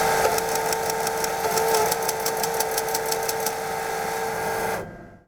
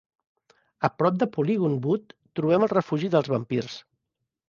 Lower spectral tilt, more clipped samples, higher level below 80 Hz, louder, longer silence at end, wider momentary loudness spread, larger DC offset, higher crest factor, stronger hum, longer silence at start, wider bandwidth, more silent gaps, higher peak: second, -2 dB/octave vs -8 dB/octave; neither; first, -52 dBFS vs -66 dBFS; about the same, -24 LUFS vs -25 LUFS; second, 0.1 s vs 0.7 s; about the same, 6 LU vs 8 LU; neither; about the same, 20 dB vs 20 dB; neither; second, 0 s vs 0.8 s; first, over 20 kHz vs 7.2 kHz; neither; about the same, -6 dBFS vs -6 dBFS